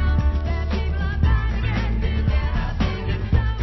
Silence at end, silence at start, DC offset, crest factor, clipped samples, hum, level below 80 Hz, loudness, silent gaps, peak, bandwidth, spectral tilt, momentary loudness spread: 0 s; 0 s; under 0.1%; 14 dB; under 0.1%; none; -22 dBFS; -23 LUFS; none; -6 dBFS; 6 kHz; -8 dB/octave; 4 LU